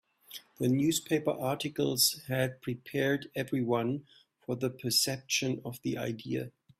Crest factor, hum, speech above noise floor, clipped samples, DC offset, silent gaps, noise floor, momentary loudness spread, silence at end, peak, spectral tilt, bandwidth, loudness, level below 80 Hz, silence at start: 18 dB; none; 20 dB; under 0.1%; under 0.1%; none; -52 dBFS; 12 LU; 0.3 s; -14 dBFS; -4 dB/octave; 16 kHz; -31 LUFS; -68 dBFS; 0.3 s